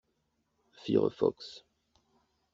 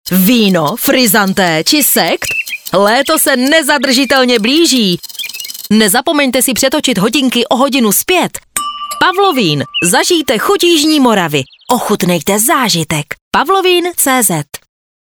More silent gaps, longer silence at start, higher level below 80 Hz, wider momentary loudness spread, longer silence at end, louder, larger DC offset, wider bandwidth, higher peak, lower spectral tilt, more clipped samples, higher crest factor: second, none vs 13.21-13.31 s; first, 0.85 s vs 0.05 s; second, -72 dBFS vs -50 dBFS; first, 18 LU vs 8 LU; first, 0.95 s vs 0.45 s; second, -31 LUFS vs -10 LUFS; neither; second, 7.6 kHz vs over 20 kHz; second, -14 dBFS vs 0 dBFS; first, -6.5 dB/octave vs -3 dB/octave; neither; first, 22 dB vs 12 dB